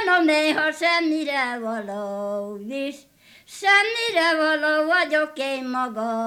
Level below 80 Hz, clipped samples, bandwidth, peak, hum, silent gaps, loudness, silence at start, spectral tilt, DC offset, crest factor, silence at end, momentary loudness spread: -72 dBFS; under 0.1%; 15.5 kHz; -4 dBFS; none; none; -21 LUFS; 0 s; -3 dB/octave; under 0.1%; 18 dB; 0 s; 12 LU